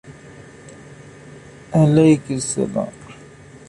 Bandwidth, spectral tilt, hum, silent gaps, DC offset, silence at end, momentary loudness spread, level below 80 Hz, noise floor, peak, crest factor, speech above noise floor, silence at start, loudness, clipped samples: 11.5 kHz; -6.5 dB/octave; none; none; under 0.1%; 0.55 s; 28 LU; -52 dBFS; -42 dBFS; -4 dBFS; 18 dB; 26 dB; 0.05 s; -18 LUFS; under 0.1%